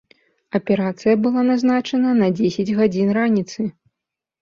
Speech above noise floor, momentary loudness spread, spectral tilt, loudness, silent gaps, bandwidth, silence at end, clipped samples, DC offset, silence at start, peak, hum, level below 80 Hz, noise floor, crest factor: 66 dB; 9 LU; -7 dB/octave; -19 LUFS; none; 7.2 kHz; 0.7 s; under 0.1%; under 0.1%; 0.55 s; -4 dBFS; none; -60 dBFS; -84 dBFS; 14 dB